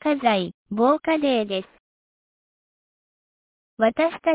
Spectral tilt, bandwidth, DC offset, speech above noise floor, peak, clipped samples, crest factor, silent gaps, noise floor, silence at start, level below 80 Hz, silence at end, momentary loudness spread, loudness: -9 dB/octave; 4 kHz; under 0.1%; over 69 dB; -8 dBFS; under 0.1%; 16 dB; 0.54-0.66 s, 1.80-3.77 s; under -90 dBFS; 0.05 s; -64 dBFS; 0 s; 8 LU; -22 LUFS